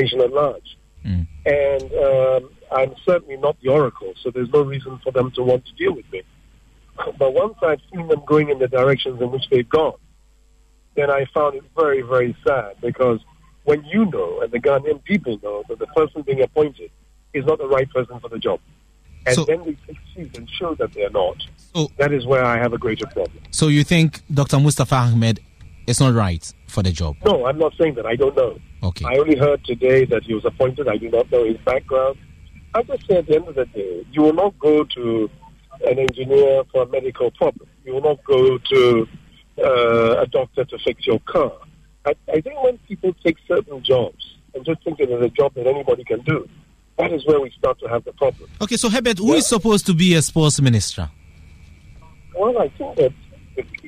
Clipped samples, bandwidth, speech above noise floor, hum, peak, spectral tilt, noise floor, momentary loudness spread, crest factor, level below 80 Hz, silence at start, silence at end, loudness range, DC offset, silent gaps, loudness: under 0.1%; 15 kHz; 35 dB; none; -4 dBFS; -5.5 dB/octave; -53 dBFS; 12 LU; 16 dB; -44 dBFS; 0 s; 0 s; 4 LU; under 0.1%; none; -19 LUFS